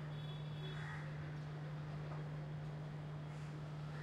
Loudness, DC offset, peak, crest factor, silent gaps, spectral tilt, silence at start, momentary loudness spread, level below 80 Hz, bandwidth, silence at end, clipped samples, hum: -47 LUFS; under 0.1%; -36 dBFS; 10 dB; none; -7.5 dB/octave; 0 s; 2 LU; -66 dBFS; 8.8 kHz; 0 s; under 0.1%; none